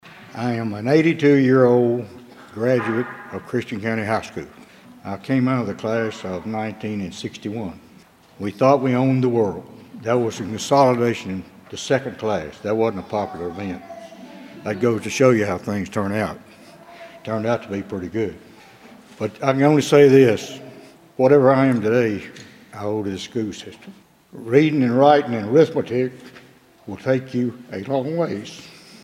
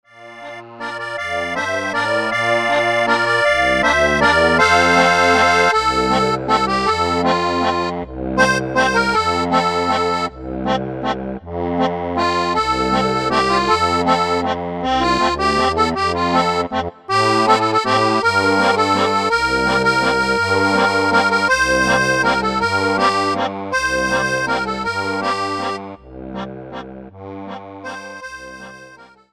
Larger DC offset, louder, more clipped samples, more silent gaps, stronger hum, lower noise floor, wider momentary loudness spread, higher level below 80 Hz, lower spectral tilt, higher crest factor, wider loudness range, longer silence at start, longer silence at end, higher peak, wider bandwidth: second, under 0.1% vs 0.2%; second, -20 LUFS vs -16 LUFS; neither; neither; neither; first, -49 dBFS vs -43 dBFS; first, 20 LU vs 17 LU; second, -60 dBFS vs -40 dBFS; first, -6.5 dB/octave vs -4 dB/octave; about the same, 20 dB vs 18 dB; about the same, 8 LU vs 7 LU; about the same, 0.05 s vs 0.15 s; about the same, 0.35 s vs 0.3 s; about the same, 0 dBFS vs 0 dBFS; about the same, 15 kHz vs 14.5 kHz